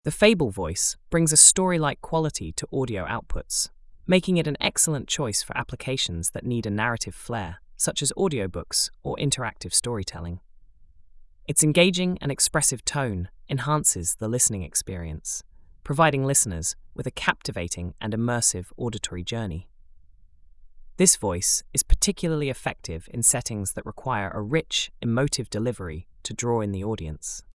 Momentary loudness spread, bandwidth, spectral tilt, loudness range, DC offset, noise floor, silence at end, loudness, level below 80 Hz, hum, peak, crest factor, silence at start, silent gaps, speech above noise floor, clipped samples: 13 LU; 12 kHz; -3 dB/octave; 7 LU; under 0.1%; -51 dBFS; 0.15 s; -23 LUFS; -38 dBFS; none; 0 dBFS; 26 dB; 0.05 s; none; 27 dB; under 0.1%